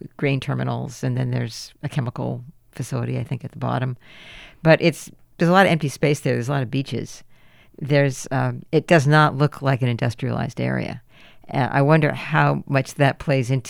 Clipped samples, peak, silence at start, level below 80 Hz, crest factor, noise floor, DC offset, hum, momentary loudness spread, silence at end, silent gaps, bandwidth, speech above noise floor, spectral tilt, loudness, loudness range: under 0.1%; -2 dBFS; 0.05 s; -52 dBFS; 20 dB; -50 dBFS; under 0.1%; none; 16 LU; 0 s; none; 13 kHz; 29 dB; -6.5 dB/octave; -21 LUFS; 7 LU